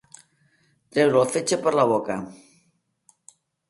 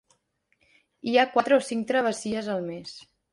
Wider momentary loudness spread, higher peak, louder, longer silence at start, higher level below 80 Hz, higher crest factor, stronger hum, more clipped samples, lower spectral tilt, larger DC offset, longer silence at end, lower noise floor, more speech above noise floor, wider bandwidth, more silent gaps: second, 12 LU vs 17 LU; about the same, -6 dBFS vs -8 dBFS; first, -22 LUFS vs -25 LUFS; about the same, 0.95 s vs 1.05 s; about the same, -68 dBFS vs -70 dBFS; about the same, 20 dB vs 20 dB; neither; neither; about the same, -4.5 dB/octave vs -4 dB/octave; neither; first, 1.35 s vs 0.3 s; about the same, -69 dBFS vs -71 dBFS; about the same, 47 dB vs 46 dB; about the same, 11.5 kHz vs 11.5 kHz; neither